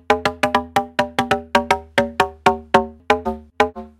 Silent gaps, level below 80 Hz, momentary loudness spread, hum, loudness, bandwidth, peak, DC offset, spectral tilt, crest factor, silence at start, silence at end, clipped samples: none; -44 dBFS; 3 LU; none; -19 LUFS; 17 kHz; 0 dBFS; under 0.1%; -4 dB/octave; 20 dB; 0.1 s; 0.15 s; under 0.1%